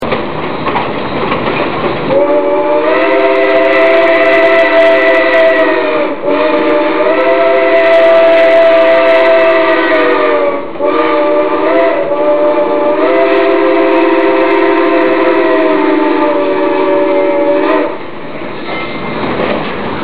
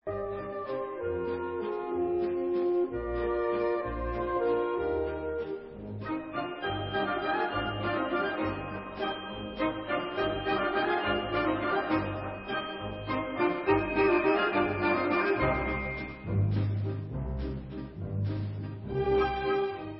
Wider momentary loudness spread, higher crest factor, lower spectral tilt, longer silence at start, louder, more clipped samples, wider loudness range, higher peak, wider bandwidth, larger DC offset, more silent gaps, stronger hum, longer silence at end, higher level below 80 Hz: about the same, 9 LU vs 9 LU; second, 10 dB vs 18 dB; second, -7 dB/octave vs -10.5 dB/octave; about the same, 0 s vs 0.05 s; first, -9 LUFS vs -31 LUFS; neither; about the same, 4 LU vs 5 LU; first, 0 dBFS vs -14 dBFS; second, 5.2 kHz vs 5.8 kHz; first, 6% vs under 0.1%; neither; neither; about the same, 0 s vs 0 s; about the same, -46 dBFS vs -46 dBFS